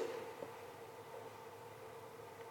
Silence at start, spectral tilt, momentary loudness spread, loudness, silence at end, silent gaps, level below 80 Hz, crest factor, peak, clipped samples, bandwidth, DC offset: 0 s; -4.5 dB/octave; 6 LU; -52 LUFS; 0 s; none; -84 dBFS; 20 dB; -30 dBFS; under 0.1%; 17 kHz; under 0.1%